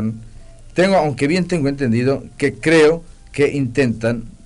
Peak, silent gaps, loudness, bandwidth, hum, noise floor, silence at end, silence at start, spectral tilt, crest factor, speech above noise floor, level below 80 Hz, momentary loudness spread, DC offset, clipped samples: -2 dBFS; none; -17 LUFS; 11 kHz; none; -38 dBFS; 0.15 s; 0 s; -6.5 dB/octave; 14 dB; 21 dB; -40 dBFS; 12 LU; under 0.1%; under 0.1%